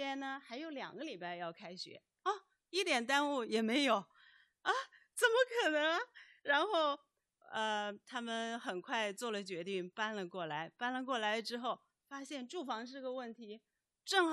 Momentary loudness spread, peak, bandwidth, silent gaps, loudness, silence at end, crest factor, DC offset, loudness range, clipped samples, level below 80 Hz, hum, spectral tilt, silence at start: 14 LU; -18 dBFS; 12.5 kHz; none; -38 LUFS; 0 s; 20 dB; under 0.1%; 6 LU; under 0.1%; under -90 dBFS; none; -3 dB/octave; 0 s